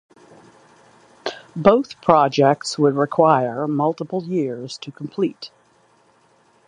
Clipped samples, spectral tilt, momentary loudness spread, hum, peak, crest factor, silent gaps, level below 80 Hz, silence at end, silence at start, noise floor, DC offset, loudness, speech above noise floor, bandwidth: under 0.1%; -6 dB/octave; 16 LU; none; 0 dBFS; 20 dB; none; -62 dBFS; 1.2 s; 1.25 s; -57 dBFS; under 0.1%; -19 LUFS; 39 dB; 11 kHz